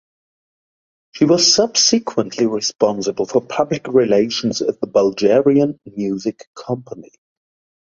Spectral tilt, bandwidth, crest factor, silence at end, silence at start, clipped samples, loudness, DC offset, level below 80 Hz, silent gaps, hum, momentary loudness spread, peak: -3.5 dB/octave; 7.6 kHz; 18 dB; 0.8 s; 1.15 s; under 0.1%; -17 LUFS; under 0.1%; -58 dBFS; 6.47-6.54 s; none; 14 LU; 0 dBFS